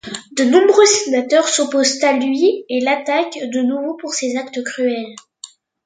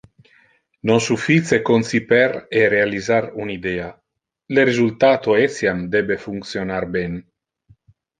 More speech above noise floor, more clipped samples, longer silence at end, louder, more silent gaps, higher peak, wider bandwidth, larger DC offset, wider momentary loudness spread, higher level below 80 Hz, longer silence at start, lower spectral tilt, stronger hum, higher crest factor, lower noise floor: second, 26 dB vs 39 dB; neither; second, 0.4 s vs 1 s; about the same, -16 LUFS vs -18 LUFS; neither; about the same, 0 dBFS vs -2 dBFS; about the same, 9.6 kHz vs 9.8 kHz; neither; about the same, 12 LU vs 11 LU; second, -66 dBFS vs -52 dBFS; second, 0.05 s vs 0.85 s; second, -1.5 dB/octave vs -5.5 dB/octave; neither; about the same, 16 dB vs 18 dB; second, -41 dBFS vs -57 dBFS